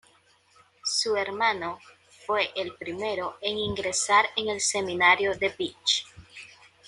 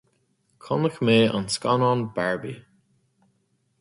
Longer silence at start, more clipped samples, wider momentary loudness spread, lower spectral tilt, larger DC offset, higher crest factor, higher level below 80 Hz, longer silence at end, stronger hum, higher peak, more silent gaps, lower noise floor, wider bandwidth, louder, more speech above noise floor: first, 0.85 s vs 0.65 s; neither; first, 17 LU vs 12 LU; second, -1.5 dB/octave vs -5.5 dB/octave; neither; about the same, 22 dB vs 20 dB; about the same, -60 dBFS vs -62 dBFS; second, 0.4 s vs 1.2 s; neither; about the same, -6 dBFS vs -6 dBFS; neither; second, -62 dBFS vs -70 dBFS; about the same, 11.5 kHz vs 11.5 kHz; second, -26 LUFS vs -23 LUFS; second, 35 dB vs 47 dB